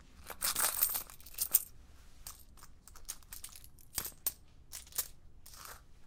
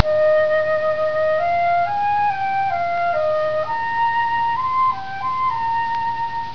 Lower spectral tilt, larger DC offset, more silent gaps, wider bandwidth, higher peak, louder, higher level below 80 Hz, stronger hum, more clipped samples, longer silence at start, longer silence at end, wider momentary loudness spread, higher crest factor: second, 0.5 dB/octave vs -5 dB/octave; second, under 0.1% vs 2%; neither; first, 18 kHz vs 5.4 kHz; second, -8 dBFS vs 0 dBFS; second, -35 LUFS vs -20 LUFS; about the same, -58 dBFS vs -56 dBFS; neither; neither; about the same, 0 s vs 0 s; about the same, 0 s vs 0 s; first, 21 LU vs 5 LU; first, 32 dB vs 20 dB